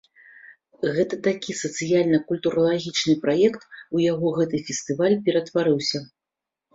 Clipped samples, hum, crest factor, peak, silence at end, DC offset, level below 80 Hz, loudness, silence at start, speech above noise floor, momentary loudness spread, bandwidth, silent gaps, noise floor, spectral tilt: under 0.1%; none; 16 dB; -6 dBFS; 0.7 s; under 0.1%; -64 dBFS; -23 LUFS; 0.45 s; 65 dB; 8 LU; 7.8 kHz; none; -87 dBFS; -5 dB/octave